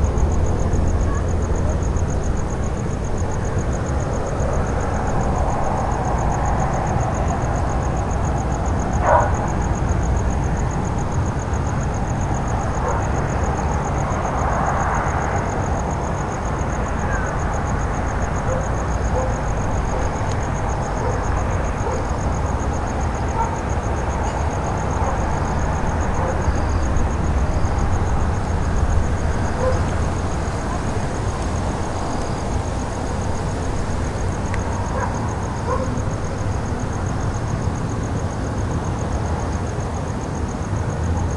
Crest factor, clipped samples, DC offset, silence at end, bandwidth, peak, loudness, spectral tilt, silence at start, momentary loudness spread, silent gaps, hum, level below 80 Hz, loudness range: 20 dB; under 0.1%; under 0.1%; 0 s; 11.5 kHz; -2 dBFS; -22 LUFS; -6.5 dB/octave; 0 s; 3 LU; none; none; -26 dBFS; 3 LU